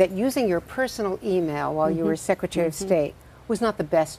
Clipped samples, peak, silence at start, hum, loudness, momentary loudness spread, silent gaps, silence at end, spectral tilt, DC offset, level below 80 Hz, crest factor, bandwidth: under 0.1%; -4 dBFS; 0 s; none; -25 LUFS; 5 LU; none; 0 s; -5.5 dB/octave; under 0.1%; -52 dBFS; 20 dB; 15.5 kHz